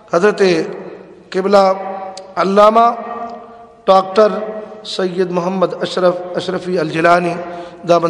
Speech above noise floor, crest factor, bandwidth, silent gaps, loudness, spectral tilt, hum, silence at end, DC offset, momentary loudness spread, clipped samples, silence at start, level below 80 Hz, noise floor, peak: 24 dB; 14 dB; 12 kHz; none; -15 LUFS; -5.5 dB/octave; none; 0 s; under 0.1%; 16 LU; 0.3%; 0.1 s; -56 dBFS; -37 dBFS; 0 dBFS